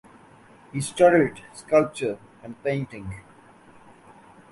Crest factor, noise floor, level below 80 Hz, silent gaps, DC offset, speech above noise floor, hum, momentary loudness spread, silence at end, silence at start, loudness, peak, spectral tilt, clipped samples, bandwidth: 20 dB; -51 dBFS; -58 dBFS; none; under 0.1%; 28 dB; none; 22 LU; 1.3 s; 0.75 s; -23 LUFS; -4 dBFS; -6 dB/octave; under 0.1%; 11.5 kHz